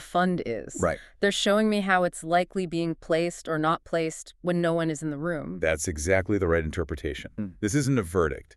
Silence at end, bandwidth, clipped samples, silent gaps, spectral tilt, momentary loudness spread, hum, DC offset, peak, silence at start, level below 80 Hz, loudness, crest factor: 0.15 s; 13.5 kHz; under 0.1%; none; -5 dB/octave; 8 LU; none; under 0.1%; -8 dBFS; 0 s; -48 dBFS; -27 LUFS; 18 dB